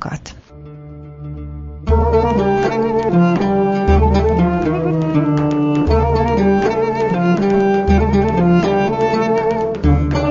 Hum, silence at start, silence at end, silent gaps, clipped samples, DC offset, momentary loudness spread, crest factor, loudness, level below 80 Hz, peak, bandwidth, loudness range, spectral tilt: none; 0 s; 0 s; none; under 0.1%; under 0.1%; 16 LU; 14 dB; -15 LUFS; -24 dBFS; -2 dBFS; 7.4 kHz; 2 LU; -8.5 dB/octave